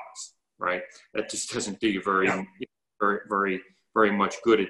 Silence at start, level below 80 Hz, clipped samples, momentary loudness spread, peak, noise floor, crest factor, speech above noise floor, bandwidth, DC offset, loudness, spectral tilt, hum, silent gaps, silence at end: 0 s; -64 dBFS; under 0.1%; 17 LU; -6 dBFS; -45 dBFS; 20 dB; 19 dB; 12 kHz; under 0.1%; -27 LUFS; -4 dB/octave; none; none; 0 s